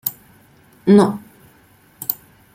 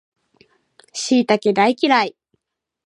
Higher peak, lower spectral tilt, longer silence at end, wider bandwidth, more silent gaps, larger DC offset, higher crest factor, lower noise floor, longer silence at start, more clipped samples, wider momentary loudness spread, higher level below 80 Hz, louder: about the same, 0 dBFS vs -2 dBFS; first, -7 dB/octave vs -4 dB/octave; second, 0.4 s vs 0.8 s; first, 16.5 kHz vs 11 kHz; neither; neither; about the same, 20 dB vs 18 dB; second, -52 dBFS vs -70 dBFS; second, 0.05 s vs 0.95 s; neither; first, 16 LU vs 11 LU; first, -60 dBFS vs -72 dBFS; about the same, -17 LUFS vs -17 LUFS